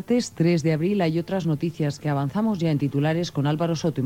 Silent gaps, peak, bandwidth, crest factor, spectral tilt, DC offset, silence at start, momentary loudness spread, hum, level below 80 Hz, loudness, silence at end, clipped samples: none; -10 dBFS; 15.5 kHz; 12 dB; -7 dB/octave; under 0.1%; 0 s; 4 LU; none; -58 dBFS; -24 LUFS; 0 s; under 0.1%